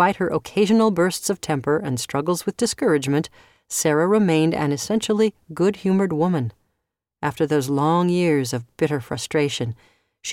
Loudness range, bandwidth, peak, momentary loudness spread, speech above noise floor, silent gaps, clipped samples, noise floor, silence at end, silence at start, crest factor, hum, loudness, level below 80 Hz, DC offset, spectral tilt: 2 LU; 17 kHz; -4 dBFS; 9 LU; 58 dB; none; under 0.1%; -79 dBFS; 0 s; 0 s; 16 dB; none; -21 LUFS; -58 dBFS; under 0.1%; -5.5 dB/octave